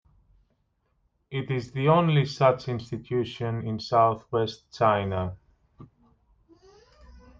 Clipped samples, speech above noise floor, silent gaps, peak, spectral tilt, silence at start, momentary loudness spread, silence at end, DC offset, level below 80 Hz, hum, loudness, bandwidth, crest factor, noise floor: under 0.1%; 47 dB; none; -8 dBFS; -7.5 dB/octave; 1.3 s; 11 LU; 0.2 s; under 0.1%; -58 dBFS; none; -26 LUFS; 7.4 kHz; 20 dB; -72 dBFS